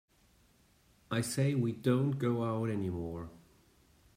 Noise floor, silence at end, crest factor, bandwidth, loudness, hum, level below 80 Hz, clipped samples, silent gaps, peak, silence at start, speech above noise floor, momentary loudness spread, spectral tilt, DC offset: -67 dBFS; 0.8 s; 18 dB; 16 kHz; -33 LUFS; none; -64 dBFS; under 0.1%; none; -18 dBFS; 1.1 s; 35 dB; 11 LU; -6.5 dB/octave; under 0.1%